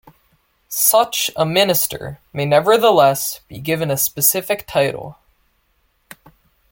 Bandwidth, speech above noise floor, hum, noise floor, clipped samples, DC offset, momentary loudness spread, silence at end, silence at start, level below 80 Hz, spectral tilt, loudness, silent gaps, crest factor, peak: 17 kHz; 46 dB; none; -63 dBFS; under 0.1%; under 0.1%; 14 LU; 1.6 s; 0.7 s; -54 dBFS; -3 dB/octave; -16 LUFS; none; 18 dB; 0 dBFS